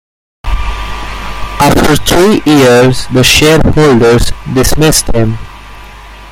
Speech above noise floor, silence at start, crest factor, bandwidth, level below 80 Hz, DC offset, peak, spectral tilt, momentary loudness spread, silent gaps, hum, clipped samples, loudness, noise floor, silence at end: 23 dB; 0.45 s; 8 dB; 17 kHz; -20 dBFS; under 0.1%; 0 dBFS; -4.5 dB/octave; 15 LU; none; none; 0.1%; -8 LUFS; -29 dBFS; 0 s